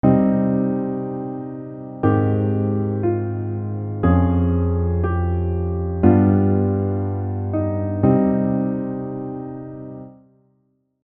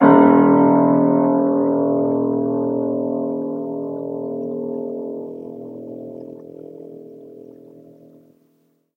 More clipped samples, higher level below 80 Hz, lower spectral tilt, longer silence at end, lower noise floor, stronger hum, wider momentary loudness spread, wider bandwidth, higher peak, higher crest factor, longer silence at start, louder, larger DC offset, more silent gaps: neither; first, -42 dBFS vs -66 dBFS; first, -13.5 dB/octave vs -11.5 dB/octave; second, 0.95 s vs 1.45 s; about the same, -66 dBFS vs -63 dBFS; neither; second, 14 LU vs 24 LU; about the same, 3.3 kHz vs 3.2 kHz; about the same, 0 dBFS vs 0 dBFS; about the same, 20 dB vs 18 dB; about the same, 0.05 s vs 0 s; about the same, -20 LUFS vs -18 LUFS; neither; neither